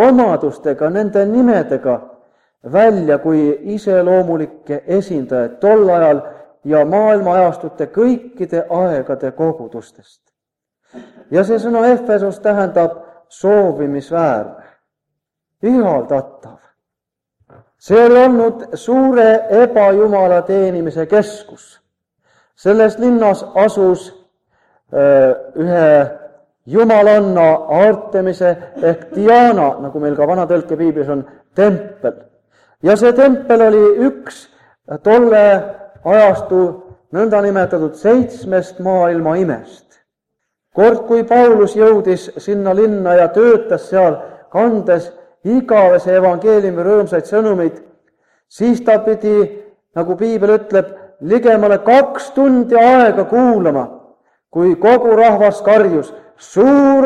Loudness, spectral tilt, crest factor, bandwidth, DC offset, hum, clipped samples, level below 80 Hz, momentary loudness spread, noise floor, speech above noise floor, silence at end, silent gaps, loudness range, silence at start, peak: -12 LUFS; -7.5 dB/octave; 12 dB; 10.5 kHz; under 0.1%; none; under 0.1%; -56 dBFS; 11 LU; -83 dBFS; 71 dB; 0 s; none; 5 LU; 0 s; 0 dBFS